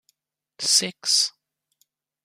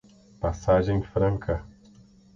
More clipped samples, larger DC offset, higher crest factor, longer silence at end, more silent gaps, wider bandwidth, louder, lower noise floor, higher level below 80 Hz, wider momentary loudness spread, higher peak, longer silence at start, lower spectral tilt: neither; neither; about the same, 22 dB vs 18 dB; first, 0.95 s vs 0.7 s; neither; first, 15.5 kHz vs 7.4 kHz; first, -20 LUFS vs -26 LUFS; first, -70 dBFS vs -54 dBFS; second, -82 dBFS vs -40 dBFS; about the same, 7 LU vs 9 LU; first, -4 dBFS vs -10 dBFS; first, 0.6 s vs 0.4 s; second, 0.5 dB/octave vs -8 dB/octave